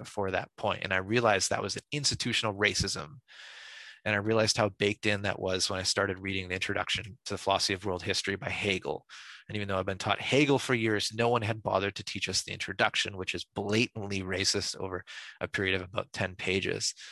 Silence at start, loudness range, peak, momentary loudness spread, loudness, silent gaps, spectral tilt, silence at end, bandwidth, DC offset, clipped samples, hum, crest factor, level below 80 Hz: 0 s; 3 LU; -8 dBFS; 11 LU; -30 LUFS; none; -3.5 dB/octave; 0 s; 12.5 kHz; under 0.1%; under 0.1%; none; 22 dB; -54 dBFS